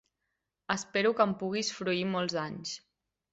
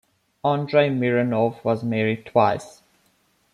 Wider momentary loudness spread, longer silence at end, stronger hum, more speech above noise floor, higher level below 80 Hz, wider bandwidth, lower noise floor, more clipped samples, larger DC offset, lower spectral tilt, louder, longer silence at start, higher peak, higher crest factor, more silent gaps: first, 11 LU vs 5 LU; second, 0.55 s vs 0.85 s; neither; first, 53 dB vs 43 dB; second, -70 dBFS vs -64 dBFS; second, 8.2 kHz vs 11.5 kHz; first, -84 dBFS vs -64 dBFS; neither; neither; second, -4 dB/octave vs -7.5 dB/octave; second, -31 LUFS vs -22 LUFS; first, 0.7 s vs 0.45 s; second, -12 dBFS vs -4 dBFS; about the same, 22 dB vs 20 dB; neither